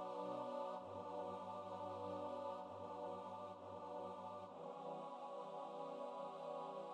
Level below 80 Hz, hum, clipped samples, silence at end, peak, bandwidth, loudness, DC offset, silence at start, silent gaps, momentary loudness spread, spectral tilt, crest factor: under -90 dBFS; none; under 0.1%; 0 s; -36 dBFS; 10 kHz; -50 LUFS; under 0.1%; 0 s; none; 5 LU; -6.5 dB/octave; 14 dB